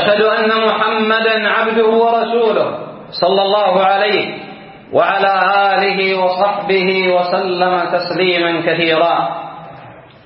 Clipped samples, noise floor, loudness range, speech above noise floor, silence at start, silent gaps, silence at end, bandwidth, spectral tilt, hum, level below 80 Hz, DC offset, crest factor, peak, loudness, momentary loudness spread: under 0.1%; -37 dBFS; 1 LU; 23 dB; 0 s; none; 0.25 s; 5.8 kHz; -9.5 dB/octave; none; -62 dBFS; under 0.1%; 14 dB; 0 dBFS; -14 LUFS; 9 LU